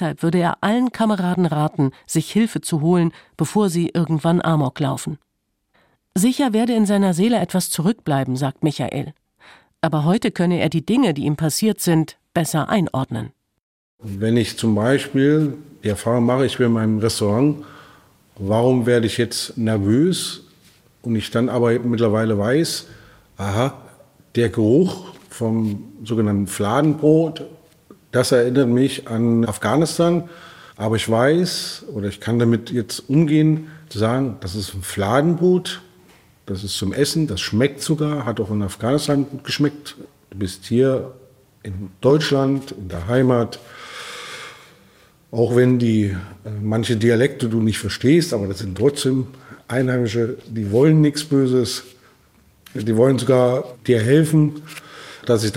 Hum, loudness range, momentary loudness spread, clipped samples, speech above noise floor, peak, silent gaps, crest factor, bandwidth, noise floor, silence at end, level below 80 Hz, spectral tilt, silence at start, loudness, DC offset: none; 3 LU; 13 LU; under 0.1%; 53 dB; -2 dBFS; 13.63-13.98 s; 18 dB; 16.5 kHz; -71 dBFS; 0 s; -56 dBFS; -6 dB/octave; 0 s; -19 LUFS; under 0.1%